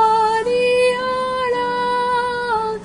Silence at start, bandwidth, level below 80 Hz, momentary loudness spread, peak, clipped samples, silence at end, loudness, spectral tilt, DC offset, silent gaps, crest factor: 0 s; 10.5 kHz; -50 dBFS; 5 LU; -6 dBFS; under 0.1%; 0 s; -18 LUFS; -3.5 dB/octave; under 0.1%; none; 12 dB